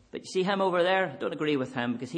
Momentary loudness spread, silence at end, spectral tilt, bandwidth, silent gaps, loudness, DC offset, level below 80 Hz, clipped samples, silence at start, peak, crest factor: 7 LU; 0 s; -5.5 dB/octave; 9.8 kHz; none; -28 LUFS; under 0.1%; -72 dBFS; under 0.1%; 0.15 s; -12 dBFS; 16 dB